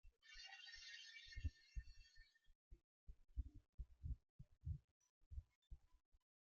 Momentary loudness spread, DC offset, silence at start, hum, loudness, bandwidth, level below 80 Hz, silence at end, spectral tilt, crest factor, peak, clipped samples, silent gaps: 14 LU; under 0.1%; 0.05 s; none; -58 LUFS; 7.2 kHz; -60 dBFS; 0.25 s; -3.5 dB/octave; 22 dB; -36 dBFS; under 0.1%; 2.55-2.71 s, 2.84-3.07 s, 3.69-3.78 s, 4.29-4.39 s, 4.84-5.01 s, 5.09-5.31 s, 5.55-5.62 s, 6.05-6.12 s